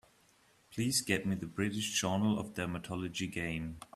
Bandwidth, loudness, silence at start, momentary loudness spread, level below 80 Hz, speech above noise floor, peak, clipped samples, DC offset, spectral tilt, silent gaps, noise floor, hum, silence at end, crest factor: 15.5 kHz; -35 LUFS; 0.7 s; 8 LU; -62 dBFS; 32 dB; -16 dBFS; under 0.1%; under 0.1%; -4 dB/octave; none; -67 dBFS; none; 0.1 s; 20 dB